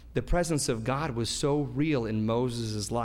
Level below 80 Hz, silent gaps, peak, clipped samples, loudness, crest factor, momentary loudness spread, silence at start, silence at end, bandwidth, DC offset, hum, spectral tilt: -40 dBFS; none; -14 dBFS; under 0.1%; -29 LUFS; 16 dB; 3 LU; 0 s; 0 s; 16 kHz; under 0.1%; none; -5 dB/octave